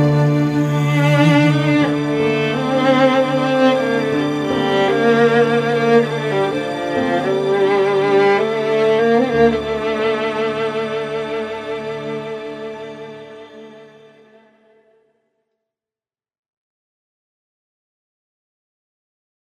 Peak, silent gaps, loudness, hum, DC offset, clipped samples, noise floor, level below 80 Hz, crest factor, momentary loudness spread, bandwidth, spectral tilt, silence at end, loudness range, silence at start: -2 dBFS; none; -16 LUFS; none; under 0.1%; under 0.1%; under -90 dBFS; -54 dBFS; 16 dB; 12 LU; 14 kHz; -7 dB/octave; 5.55 s; 13 LU; 0 s